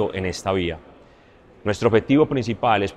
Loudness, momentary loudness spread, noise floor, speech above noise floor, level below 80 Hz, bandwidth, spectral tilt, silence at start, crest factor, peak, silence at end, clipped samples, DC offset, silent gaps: -21 LUFS; 11 LU; -51 dBFS; 30 dB; -48 dBFS; 12 kHz; -6 dB/octave; 0 s; 18 dB; -4 dBFS; 0 s; under 0.1%; under 0.1%; none